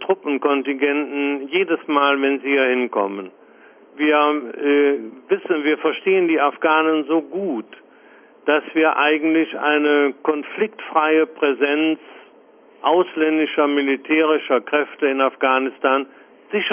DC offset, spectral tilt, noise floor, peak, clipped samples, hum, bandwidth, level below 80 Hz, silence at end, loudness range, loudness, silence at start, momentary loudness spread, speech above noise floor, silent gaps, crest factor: under 0.1%; -8 dB/octave; -49 dBFS; -4 dBFS; under 0.1%; none; 3.5 kHz; -72 dBFS; 0 s; 2 LU; -19 LUFS; 0 s; 8 LU; 31 dB; none; 16 dB